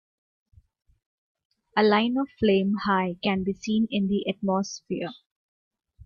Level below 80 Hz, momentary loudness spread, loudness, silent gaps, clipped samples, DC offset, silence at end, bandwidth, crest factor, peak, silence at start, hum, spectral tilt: -58 dBFS; 11 LU; -25 LUFS; 5.26-5.71 s; under 0.1%; under 0.1%; 0 s; 7.2 kHz; 20 dB; -8 dBFS; 1.75 s; none; -6 dB/octave